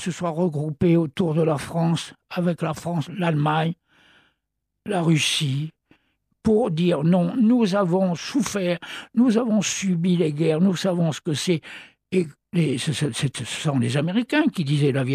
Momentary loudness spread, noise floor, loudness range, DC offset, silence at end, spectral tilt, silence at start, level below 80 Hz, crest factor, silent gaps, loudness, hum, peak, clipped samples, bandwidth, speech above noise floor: 8 LU; -79 dBFS; 4 LU; under 0.1%; 0 s; -6 dB/octave; 0 s; -58 dBFS; 14 dB; none; -22 LUFS; none; -8 dBFS; under 0.1%; 14 kHz; 58 dB